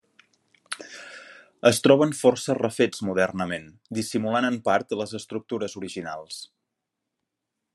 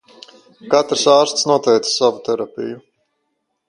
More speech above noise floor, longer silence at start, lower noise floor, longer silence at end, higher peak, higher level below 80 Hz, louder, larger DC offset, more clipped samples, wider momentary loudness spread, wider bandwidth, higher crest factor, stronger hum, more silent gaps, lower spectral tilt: about the same, 59 dB vs 56 dB; about the same, 0.7 s vs 0.65 s; first, -83 dBFS vs -72 dBFS; first, 1.3 s vs 0.9 s; about the same, -2 dBFS vs 0 dBFS; second, -72 dBFS vs -66 dBFS; second, -24 LUFS vs -16 LUFS; neither; neither; first, 20 LU vs 15 LU; about the same, 12.5 kHz vs 11.5 kHz; first, 24 dB vs 18 dB; neither; neither; first, -4.5 dB/octave vs -3 dB/octave